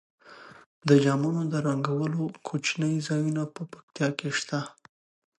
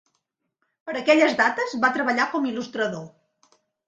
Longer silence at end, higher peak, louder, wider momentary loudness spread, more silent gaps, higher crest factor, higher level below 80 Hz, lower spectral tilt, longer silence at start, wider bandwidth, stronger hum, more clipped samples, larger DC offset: about the same, 0.7 s vs 0.8 s; second, -8 dBFS vs -4 dBFS; second, -27 LUFS vs -22 LUFS; about the same, 14 LU vs 13 LU; first, 0.66-0.81 s, 3.83-3.88 s vs none; about the same, 22 dB vs 20 dB; about the same, -74 dBFS vs -72 dBFS; first, -6 dB/octave vs -4 dB/octave; second, 0.25 s vs 0.85 s; first, 11.5 kHz vs 9.2 kHz; neither; neither; neither